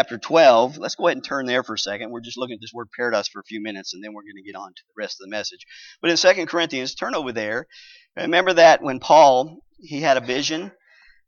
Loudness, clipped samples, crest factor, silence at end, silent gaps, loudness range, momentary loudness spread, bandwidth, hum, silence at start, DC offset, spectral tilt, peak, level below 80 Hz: -19 LUFS; under 0.1%; 18 dB; 0.6 s; none; 12 LU; 21 LU; 7.4 kHz; none; 0 s; under 0.1%; -3 dB/octave; -2 dBFS; -68 dBFS